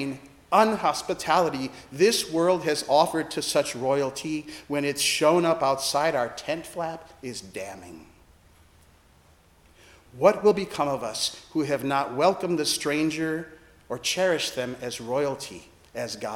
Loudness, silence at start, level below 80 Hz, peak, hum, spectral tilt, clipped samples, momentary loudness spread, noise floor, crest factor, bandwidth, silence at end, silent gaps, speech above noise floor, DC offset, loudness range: -25 LUFS; 0 s; -62 dBFS; -4 dBFS; none; -3.5 dB/octave; under 0.1%; 15 LU; -58 dBFS; 22 dB; 17 kHz; 0 s; none; 32 dB; under 0.1%; 7 LU